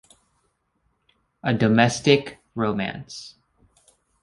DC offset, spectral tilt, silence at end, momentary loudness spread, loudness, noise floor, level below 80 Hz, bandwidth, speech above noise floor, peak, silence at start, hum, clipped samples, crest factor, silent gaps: under 0.1%; -5.5 dB/octave; 0.95 s; 20 LU; -21 LUFS; -71 dBFS; -58 dBFS; 11.5 kHz; 49 dB; -2 dBFS; 1.45 s; none; under 0.1%; 24 dB; none